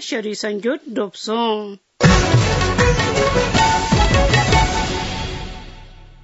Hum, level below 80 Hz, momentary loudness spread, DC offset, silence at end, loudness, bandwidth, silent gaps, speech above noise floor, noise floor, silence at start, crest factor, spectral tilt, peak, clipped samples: none; -26 dBFS; 11 LU; under 0.1%; 0.15 s; -17 LUFS; 8 kHz; none; 21 dB; -39 dBFS; 0 s; 18 dB; -4.5 dB/octave; 0 dBFS; under 0.1%